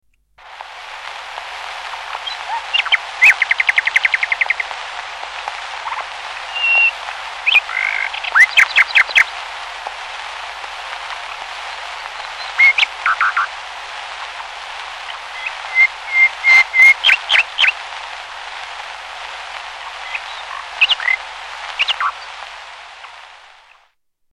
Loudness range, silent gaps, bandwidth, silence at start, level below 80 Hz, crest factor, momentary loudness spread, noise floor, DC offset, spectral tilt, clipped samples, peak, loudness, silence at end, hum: 9 LU; none; 16.5 kHz; 0.4 s; -56 dBFS; 16 dB; 19 LU; -60 dBFS; under 0.1%; 2.5 dB/octave; under 0.1%; -2 dBFS; -13 LUFS; 0.85 s; 50 Hz at -55 dBFS